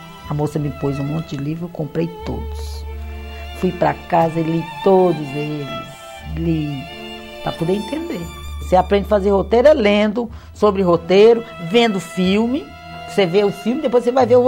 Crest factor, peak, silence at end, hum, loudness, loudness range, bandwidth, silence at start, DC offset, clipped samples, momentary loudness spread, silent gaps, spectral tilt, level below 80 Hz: 16 dB; -2 dBFS; 0 s; none; -18 LUFS; 9 LU; 16 kHz; 0 s; under 0.1%; under 0.1%; 17 LU; none; -6.5 dB/octave; -36 dBFS